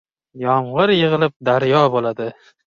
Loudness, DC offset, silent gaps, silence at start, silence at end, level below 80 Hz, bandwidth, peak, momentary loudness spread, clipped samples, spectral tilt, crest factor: -17 LUFS; under 0.1%; 1.36-1.40 s; 0.35 s; 0.5 s; -58 dBFS; 7.2 kHz; -2 dBFS; 11 LU; under 0.1%; -7.5 dB/octave; 16 dB